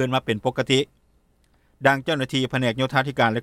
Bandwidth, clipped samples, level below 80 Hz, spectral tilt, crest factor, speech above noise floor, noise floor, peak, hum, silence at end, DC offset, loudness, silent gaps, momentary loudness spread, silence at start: 14 kHz; under 0.1%; -56 dBFS; -5 dB/octave; 20 dB; 40 dB; -62 dBFS; -2 dBFS; none; 0 s; under 0.1%; -23 LUFS; none; 4 LU; 0 s